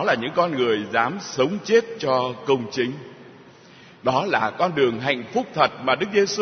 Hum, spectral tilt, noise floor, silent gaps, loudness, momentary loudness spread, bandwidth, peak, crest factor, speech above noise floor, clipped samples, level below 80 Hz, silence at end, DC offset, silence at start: none; -4.5 dB/octave; -48 dBFS; none; -22 LUFS; 6 LU; 6.6 kHz; -2 dBFS; 20 dB; 26 dB; under 0.1%; -66 dBFS; 0 s; under 0.1%; 0 s